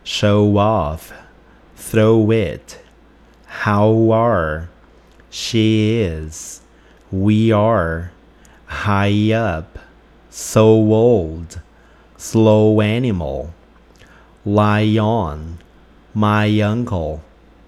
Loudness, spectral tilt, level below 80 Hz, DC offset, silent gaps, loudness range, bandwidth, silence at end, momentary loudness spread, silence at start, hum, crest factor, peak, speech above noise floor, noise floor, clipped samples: -16 LUFS; -6.5 dB/octave; -40 dBFS; under 0.1%; none; 4 LU; 13.5 kHz; 0.45 s; 20 LU; 0.05 s; none; 16 dB; 0 dBFS; 32 dB; -48 dBFS; under 0.1%